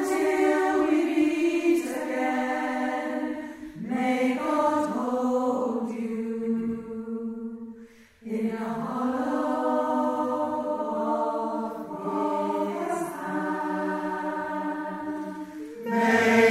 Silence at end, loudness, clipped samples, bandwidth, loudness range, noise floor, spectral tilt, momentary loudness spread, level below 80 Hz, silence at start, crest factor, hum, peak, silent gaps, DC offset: 0 s; -27 LUFS; under 0.1%; 15.5 kHz; 5 LU; -49 dBFS; -5.5 dB/octave; 11 LU; -66 dBFS; 0 s; 18 dB; none; -8 dBFS; none; under 0.1%